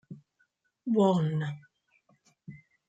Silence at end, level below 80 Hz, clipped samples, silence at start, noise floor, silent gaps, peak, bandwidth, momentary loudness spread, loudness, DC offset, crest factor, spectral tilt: 0.3 s; -74 dBFS; under 0.1%; 0.1 s; -74 dBFS; none; -12 dBFS; 9 kHz; 26 LU; -28 LUFS; under 0.1%; 20 dB; -8.5 dB/octave